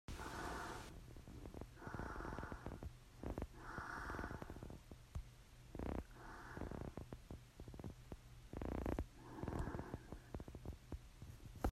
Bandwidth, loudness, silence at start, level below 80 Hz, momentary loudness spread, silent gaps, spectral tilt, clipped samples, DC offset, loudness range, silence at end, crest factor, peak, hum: 15.5 kHz; -52 LUFS; 0.1 s; -56 dBFS; 10 LU; none; -6 dB/octave; under 0.1%; under 0.1%; 3 LU; 0 s; 24 dB; -26 dBFS; none